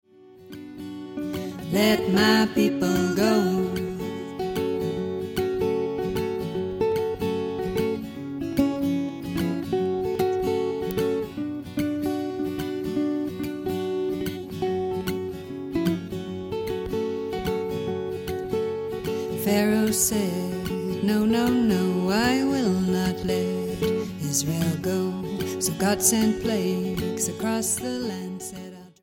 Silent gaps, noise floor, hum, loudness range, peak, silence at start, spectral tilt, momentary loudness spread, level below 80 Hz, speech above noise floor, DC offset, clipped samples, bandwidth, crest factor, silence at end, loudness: none; -47 dBFS; none; 6 LU; -6 dBFS; 0.2 s; -5 dB/octave; 10 LU; -50 dBFS; 25 dB; under 0.1%; under 0.1%; 17 kHz; 18 dB; 0.15 s; -25 LUFS